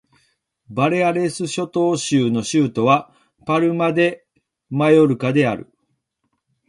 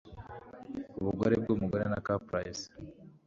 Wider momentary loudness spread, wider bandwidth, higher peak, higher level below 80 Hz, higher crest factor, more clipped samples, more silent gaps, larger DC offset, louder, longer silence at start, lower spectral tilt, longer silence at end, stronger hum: second, 10 LU vs 19 LU; first, 11.5 kHz vs 7.6 kHz; first, -2 dBFS vs -14 dBFS; about the same, -60 dBFS vs -56 dBFS; about the same, 18 dB vs 20 dB; neither; neither; neither; first, -18 LUFS vs -33 LUFS; first, 0.7 s vs 0.05 s; about the same, -6 dB/octave vs -6.5 dB/octave; first, 1.05 s vs 0.15 s; neither